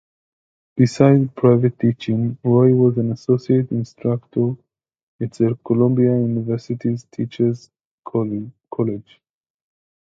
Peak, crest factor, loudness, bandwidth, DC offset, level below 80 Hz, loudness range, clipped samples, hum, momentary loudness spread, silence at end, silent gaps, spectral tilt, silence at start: 0 dBFS; 18 dB; -19 LUFS; 7.8 kHz; under 0.1%; -58 dBFS; 8 LU; under 0.1%; none; 14 LU; 1.15 s; 5.03-5.19 s, 7.85-7.98 s; -9 dB/octave; 0.75 s